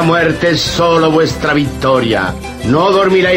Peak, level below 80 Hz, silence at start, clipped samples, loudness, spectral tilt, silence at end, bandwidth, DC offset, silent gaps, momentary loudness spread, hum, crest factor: 0 dBFS; -32 dBFS; 0 s; under 0.1%; -12 LUFS; -5.5 dB/octave; 0 s; 16.5 kHz; under 0.1%; none; 5 LU; none; 10 dB